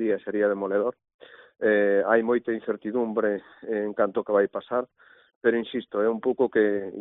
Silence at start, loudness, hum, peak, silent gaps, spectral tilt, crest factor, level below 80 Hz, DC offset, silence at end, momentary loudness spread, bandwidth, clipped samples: 0 s; -25 LUFS; none; -6 dBFS; 1.14-1.19 s, 5.36-5.41 s; -4.5 dB/octave; 18 dB; -70 dBFS; under 0.1%; 0 s; 8 LU; 4 kHz; under 0.1%